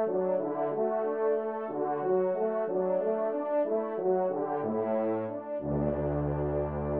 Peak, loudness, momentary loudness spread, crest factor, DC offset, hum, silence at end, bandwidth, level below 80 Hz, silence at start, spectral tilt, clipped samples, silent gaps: -18 dBFS; -30 LUFS; 3 LU; 12 dB; under 0.1%; none; 0 s; 3.5 kHz; -50 dBFS; 0 s; -9.5 dB/octave; under 0.1%; none